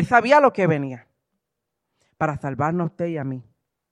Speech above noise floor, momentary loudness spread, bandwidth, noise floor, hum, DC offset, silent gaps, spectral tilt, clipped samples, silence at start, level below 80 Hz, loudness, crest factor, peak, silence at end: 61 dB; 17 LU; 10.5 kHz; -81 dBFS; none; under 0.1%; none; -7 dB/octave; under 0.1%; 0 s; -56 dBFS; -21 LUFS; 20 dB; -2 dBFS; 0.5 s